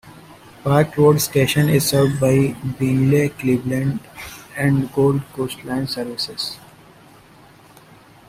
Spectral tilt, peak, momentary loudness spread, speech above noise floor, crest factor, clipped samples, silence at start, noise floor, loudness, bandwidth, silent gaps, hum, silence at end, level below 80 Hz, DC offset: -6 dB/octave; -2 dBFS; 12 LU; 29 dB; 18 dB; under 0.1%; 0.05 s; -47 dBFS; -19 LUFS; 16 kHz; none; none; 1.7 s; -48 dBFS; under 0.1%